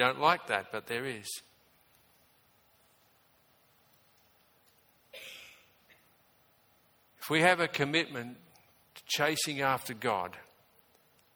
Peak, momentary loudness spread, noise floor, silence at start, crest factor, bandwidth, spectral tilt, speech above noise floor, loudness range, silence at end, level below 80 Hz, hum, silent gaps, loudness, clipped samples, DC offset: -8 dBFS; 23 LU; -67 dBFS; 0 s; 28 dB; over 20 kHz; -3.5 dB/octave; 36 dB; 24 LU; 0.95 s; -76 dBFS; none; none; -31 LUFS; under 0.1%; under 0.1%